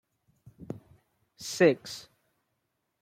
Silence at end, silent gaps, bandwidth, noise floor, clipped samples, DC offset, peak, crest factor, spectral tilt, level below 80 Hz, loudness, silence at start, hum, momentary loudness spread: 1 s; none; 16 kHz; -80 dBFS; under 0.1%; under 0.1%; -10 dBFS; 24 dB; -4.5 dB/octave; -72 dBFS; -26 LUFS; 0.6 s; none; 20 LU